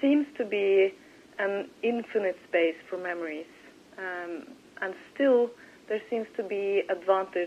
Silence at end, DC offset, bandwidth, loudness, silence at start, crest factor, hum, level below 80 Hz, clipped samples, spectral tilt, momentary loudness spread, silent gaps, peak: 0 s; under 0.1%; 9.4 kHz; -29 LUFS; 0 s; 18 dB; none; -78 dBFS; under 0.1%; -5.5 dB/octave; 15 LU; none; -10 dBFS